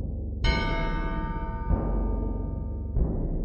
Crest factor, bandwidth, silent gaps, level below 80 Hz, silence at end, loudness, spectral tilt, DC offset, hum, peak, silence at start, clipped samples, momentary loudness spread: 16 dB; 7 kHz; none; -30 dBFS; 0 s; -30 LUFS; -7 dB/octave; under 0.1%; none; -10 dBFS; 0 s; under 0.1%; 6 LU